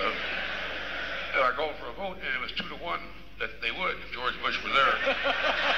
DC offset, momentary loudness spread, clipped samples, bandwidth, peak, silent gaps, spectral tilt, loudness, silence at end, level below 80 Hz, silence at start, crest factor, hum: 0.7%; 12 LU; under 0.1%; 15 kHz; -12 dBFS; none; -3.5 dB/octave; -29 LUFS; 0 s; -52 dBFS; 0 s; 18 dB; none